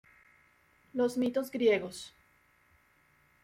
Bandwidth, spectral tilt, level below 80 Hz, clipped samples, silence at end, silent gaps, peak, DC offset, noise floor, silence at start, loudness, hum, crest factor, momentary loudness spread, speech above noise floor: 16 kHz; -4.5 dB/octave; -74 dBFS; under 0.1%; 1.35 s; none; -16 dBFS; under 0.1%; -67 dBFS; 0.95 s; -31 LUFS; none; 20 dB; 16 LU; 37 dB